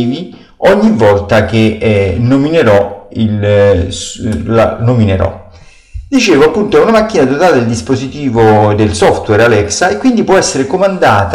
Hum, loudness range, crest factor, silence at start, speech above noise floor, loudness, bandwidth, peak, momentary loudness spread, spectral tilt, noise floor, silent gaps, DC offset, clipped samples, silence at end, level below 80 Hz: none; 2 LU; 8 dB; 0 s; 28 dB; -10 LUFS; 13 kHz; -2 dBFS; 8 LU; -5.5 dB/octave; -37 dBFS; none; under 0.1%; under 0.1%; 0 s; -32 dBFS